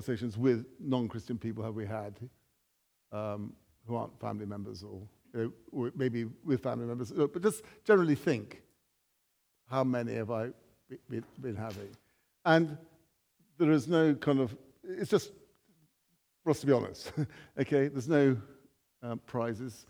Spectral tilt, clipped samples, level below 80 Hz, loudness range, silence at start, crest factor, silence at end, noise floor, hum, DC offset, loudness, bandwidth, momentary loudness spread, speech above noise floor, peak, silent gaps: -7 dB/octave; under 0.1%; -72 dBFS; 10 LU; 0 s; 22 dB; 0.05 s; -77 dBFS; none; under 0.1%; -33 LUFS; over 20 kHz; 18 LU; 45 dB; -10 dBFS; none